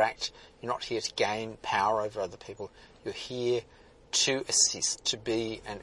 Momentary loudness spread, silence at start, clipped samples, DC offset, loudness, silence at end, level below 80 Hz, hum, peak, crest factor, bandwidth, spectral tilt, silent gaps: 17 LU; 0 s; under 0.1%; under 0.1%; -29 LUFS; 0 s; -62 dBFS; none; -10 dBFS; 22 dB; 11.5 kHz; -1.5 dB/octave; none